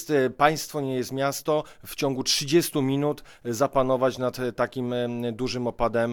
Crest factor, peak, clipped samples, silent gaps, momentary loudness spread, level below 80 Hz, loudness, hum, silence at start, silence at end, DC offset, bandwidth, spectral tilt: 20 dB; -4 dBFS; under 0.1%; none; 7 LU; -50 dBFS; -25 LUFS; none; 0 s; 0 s; under 0.1%; 19.5 kHz; -4.5 dB/octave